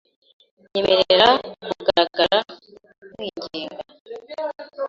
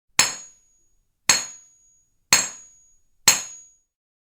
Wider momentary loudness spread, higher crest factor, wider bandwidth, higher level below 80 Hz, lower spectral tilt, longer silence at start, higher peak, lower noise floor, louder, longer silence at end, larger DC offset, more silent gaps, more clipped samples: first, 22 LU vs 18 LU; second, 20 dB vs 26 dB; second, 7.6 kHz vs over 20 kHz; first, -58 dBFS vs -66 dBFS; first, -4 dB/octave vs 1 dB/octave; first, 0.75 s vs 0.2 s; about the same, -2 dBFS vs 0 dBFS; second, -45 dBFS vs -65 dBFS; about the same, -20 LUFS vs -20 LUFS; second, 0 s vs 0.7 s; neither; first, 4.00-4.05 s vs none; neither